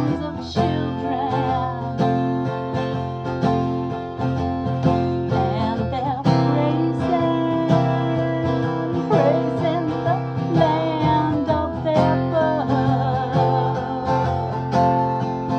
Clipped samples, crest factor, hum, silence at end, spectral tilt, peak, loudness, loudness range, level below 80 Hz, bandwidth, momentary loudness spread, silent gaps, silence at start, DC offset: under 0.1%; 16 dB; none; 0 s; -8.5 dB/octave; -4 dBFS; -21 LUFS; 3 LU; -44 dBFS; 6.8 kHz; 6 LU; none; 0 s; under 0.1%